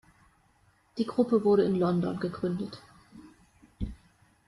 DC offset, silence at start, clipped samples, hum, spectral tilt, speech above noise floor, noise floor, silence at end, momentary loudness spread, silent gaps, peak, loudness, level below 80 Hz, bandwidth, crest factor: under 0.1%; 0.95 s; under 0.1%; none; -8.5 dB/octave; 39 dB; -66 dBFS; 0.55 s; 17 LU; none; -12 dBFS; -29 LUFS; -52 dBFS; 11 kHz; 18 dB